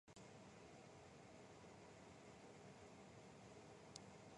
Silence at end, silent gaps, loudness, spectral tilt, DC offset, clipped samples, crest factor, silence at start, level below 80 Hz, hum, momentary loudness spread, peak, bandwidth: 0 s; none; -62 LUFS; -4.5 dB/octave; under 0.1%; under 0.1%; 30 dB; 0.05 s; -80 dBFS; none; 3 LU; -32 dBFS; 11 kHz